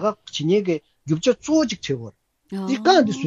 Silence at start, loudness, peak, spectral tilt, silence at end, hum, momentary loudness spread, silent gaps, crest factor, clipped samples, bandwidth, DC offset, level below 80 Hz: 0 s; -21 LUFS; -4 dBFS; -5 dB/octave; 0 s; none; 13 LU; none; 18 dB; under 0.1%; 8 kHz; under 0.1%; -60 dBFS